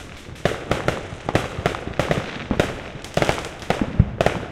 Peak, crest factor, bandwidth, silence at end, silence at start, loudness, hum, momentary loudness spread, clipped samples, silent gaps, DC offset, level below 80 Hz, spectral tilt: 0 dBFS; 24 dB; 17 kHz; 0 s; 0 s; -24 LUFS; none; 7 LU; under 0.1%; none; under 0.1%; -34 dBFS; -5.5 dB/octave